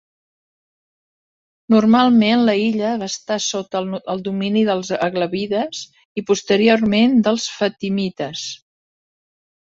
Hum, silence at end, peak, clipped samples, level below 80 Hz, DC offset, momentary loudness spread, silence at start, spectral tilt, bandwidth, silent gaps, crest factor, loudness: none; 1.2 s; -2 dBFS; under 0.1%; -60 dBFS; under 0.1%; 12 LU; 1.7 s; -5 dB/octave; 7.8 kHz; 6.05-6.16 s; 18 dB; -18 LUFS